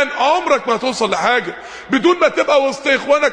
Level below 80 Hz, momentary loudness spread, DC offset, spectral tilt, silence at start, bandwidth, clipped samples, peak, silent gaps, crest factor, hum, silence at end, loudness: -56 dBFS; 5 LU; under 0.1%; -3 dB/octave; 0 s; 10.5 kHz; under 0.1%; 0 dBFS; none; 14 dB; none; 0 s; -15 LUFS